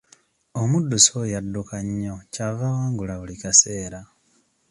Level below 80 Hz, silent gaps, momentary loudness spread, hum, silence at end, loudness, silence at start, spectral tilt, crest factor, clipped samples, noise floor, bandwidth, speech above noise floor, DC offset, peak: -50 dBFS; none; 17 LU; none; 0.65 s; -21 LUFS; 0.55 s; -3.5 dB/octave; 24 dB; under 0.1%; -64 dBFS; 11.5 kHz; 41 dB; under 0.1%; 0 dBFS